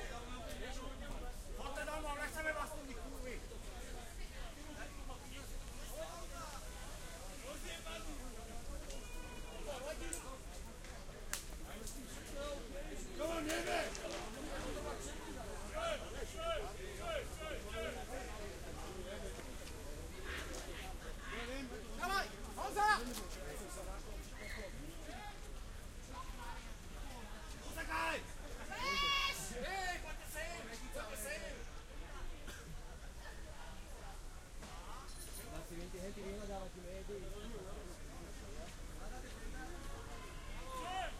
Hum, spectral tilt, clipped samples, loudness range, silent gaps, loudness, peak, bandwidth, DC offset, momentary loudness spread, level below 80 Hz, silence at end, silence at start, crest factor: none; -3 dB/octave; under 0.1%; 10 LU; none; -46 LUFS; -18 dBFS; 16 kHz; under 0.1%; 12 LU; -50 dBFS; 0 s; 0 s; 26 dB